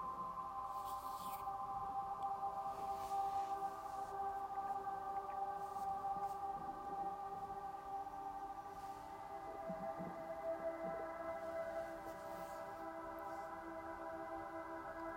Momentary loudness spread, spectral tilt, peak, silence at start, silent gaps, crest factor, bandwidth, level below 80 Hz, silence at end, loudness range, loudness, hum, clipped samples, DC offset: 6 LU; -5 dB/octave; -32 dBFS; 0 s; none; 14 dB; 16 kHz; -70 dBFS; 0 s; 4 LU; -46 LUFS; none; under 0.1%; under 0.1%